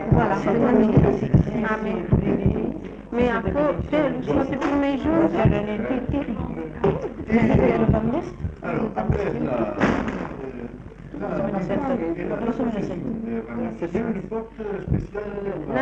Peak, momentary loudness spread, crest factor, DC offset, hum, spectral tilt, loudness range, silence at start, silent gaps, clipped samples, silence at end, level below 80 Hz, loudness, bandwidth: -4 dBFS; 12 LU; 18 dB; under 0.1%; none; -9 dB/octave; 6 LU; 0 s; none; under 0.1%; 0 s; -36 dBFS; -23 LUFS; 7.6 kHz